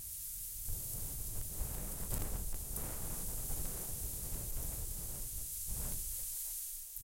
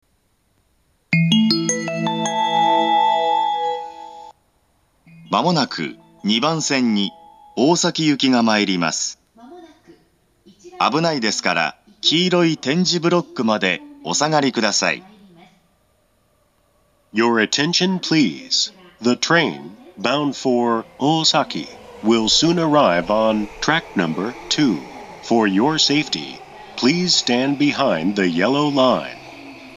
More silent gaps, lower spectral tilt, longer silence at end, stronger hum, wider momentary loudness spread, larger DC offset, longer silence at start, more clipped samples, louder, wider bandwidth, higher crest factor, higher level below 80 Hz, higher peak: neither; about the same, -3 dB/octave vs -4 dB/octave; about the same, 0 s vs 0 s; neither; second, 2 LU vs 11 LU; neither; second, 0 s vs 1.1 s; neither; second, -40 LUFS vs -18 LUFS; first, 17 kHz vs 12 kHz; about the same, 18 dB vs 20 dB; first, -46 dBFS vs -56 dBFS; second, -24 dBFS vs 0 dBFS